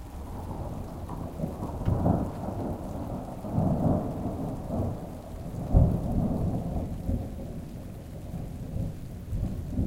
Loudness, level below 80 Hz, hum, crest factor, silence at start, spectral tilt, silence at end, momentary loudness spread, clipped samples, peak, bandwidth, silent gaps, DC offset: -32 LUFS; -36 dBFS; none; 22 dB; 0 s; -9.5 dB/octave; 0 s; 13 LU; under 0.1%; -8 dBFS; 16.5 kHz; none; under 0.1%